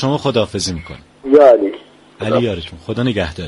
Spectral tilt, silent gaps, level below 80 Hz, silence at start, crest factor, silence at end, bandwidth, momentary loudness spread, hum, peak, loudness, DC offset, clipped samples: -5.5 dB/octave; none; -42 dBFS; 0 s; 16 dB; 0 s; 11.5 kHz; 20 LU; none; 0 dBFS; -15 LUFS; under 0.1%; under 0.1%